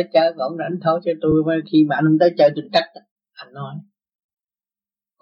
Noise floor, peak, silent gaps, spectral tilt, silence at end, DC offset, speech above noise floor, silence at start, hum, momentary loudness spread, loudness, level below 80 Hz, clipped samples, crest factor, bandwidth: under -90 dBFS; -2 dBFS; 3.11-3.16 s; -8 dB/octave; 1.4 s; under 0.1%; over 72 dB; 0 s; none; 18 LU; -18 LUFS; -54 dBFS; under 0.1%; 16 dB; 6.6 kHz